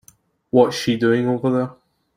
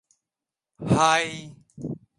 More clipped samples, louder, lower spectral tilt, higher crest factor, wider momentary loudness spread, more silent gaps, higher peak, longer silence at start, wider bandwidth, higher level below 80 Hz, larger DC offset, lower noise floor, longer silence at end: neither; first, -19 LUFS vs -22 LUFS; first, -6 dB/octave vs -4.5 dB/octave; about the same, 18 dB vs 22 dB; second, 6 LU vs 19 LU; neither; first, -2 dBFS vs -6 dBFS; second, 0.55 s vs 0.8 s; first, 15.5 kHz vs 11.5 kHz; second, -60 dBFS vs -54 dBFS; neither; second, -55 dBFS vs -89 dBFS; first, 0.45 s vs 0.2 s